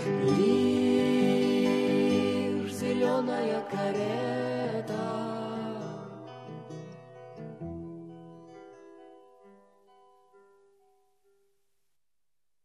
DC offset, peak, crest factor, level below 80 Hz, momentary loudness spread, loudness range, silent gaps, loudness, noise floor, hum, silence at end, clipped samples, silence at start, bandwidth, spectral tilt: under 0.1%; -12 dBFS; 18 dB; -70 dBFS; 21 LU; 20 LU; none; -28 LUFS; -89 dBFS; none; 3.5 s; under 0.1%; 0 s; 13 kHz; -6.5 dB/octave